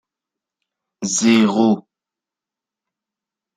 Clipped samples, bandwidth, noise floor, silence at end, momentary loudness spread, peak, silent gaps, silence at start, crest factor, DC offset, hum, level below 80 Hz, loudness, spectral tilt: under 0.1%; 9.6 kHz; -88 dBFS; 1.75 s; 10 LU; -2 dBFS; none; 1 s; 20 dB; under 0.1%; none; -66 dBFS; -16 LUFS; -4 dB/octave